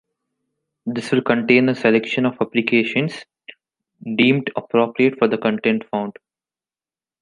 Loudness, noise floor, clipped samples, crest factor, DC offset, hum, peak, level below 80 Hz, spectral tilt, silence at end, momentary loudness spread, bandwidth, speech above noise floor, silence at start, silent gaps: -19 LUFS; under -90 dBFS; under 0.1%; 18 dB; under 0.1%; none; -2 dBFS; -66 dBFS; -6.5 dB/octave; 1.1 s; 11 LU; 10.5 kHz; over 72 dB; 0.85 s; none